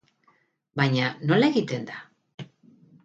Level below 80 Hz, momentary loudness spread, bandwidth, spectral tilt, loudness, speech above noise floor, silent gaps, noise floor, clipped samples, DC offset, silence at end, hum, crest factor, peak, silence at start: -68 dBFS; 23 LU; 7.8 kHz; -6.5 dB/octave; -24 LUFS; 42 dB; 2.34-2.38 s; -66 dBFS; under 0.1%; under 0.1%; 0.6 s; none; 20 dB; -8 dBFS; 0.75 s